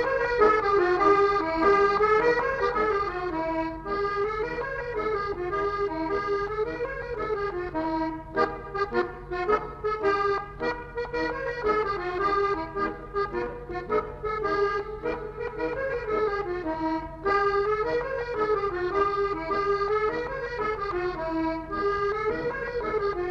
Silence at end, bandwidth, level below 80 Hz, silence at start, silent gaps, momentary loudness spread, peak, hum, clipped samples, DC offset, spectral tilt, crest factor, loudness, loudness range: 0 s; 7.2 kHz; -46 dBFS; 0 s; none; 9 LU; -10 dBFS; none; under 0.1%; under 0.1%; -6.5 dB/octave; 18 dB; -27 LUFS; 6 LU